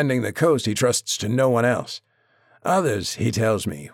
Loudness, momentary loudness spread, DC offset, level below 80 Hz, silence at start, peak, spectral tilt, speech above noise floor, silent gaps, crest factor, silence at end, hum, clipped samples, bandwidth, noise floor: -21 LUFS; 7 LU; under 0.1%; -56 dBFS; 0 s; -6 dBFS; -4.5 dB/octave; 38 dB; none; 16 dB; 0.05 s; none; under 0.1%; 17 kHz; -59 dBFS